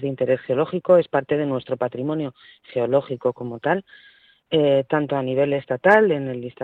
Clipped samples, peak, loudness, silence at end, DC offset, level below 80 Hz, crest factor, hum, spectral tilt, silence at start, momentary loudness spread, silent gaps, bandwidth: under 0.1%; -2 dBFS; -21 LUFS; 0 s; under 0.1%; -64 dBFS; 20 dB; none; -8 dB/octave; 0 s; 10 LU; none; 4.6 kHz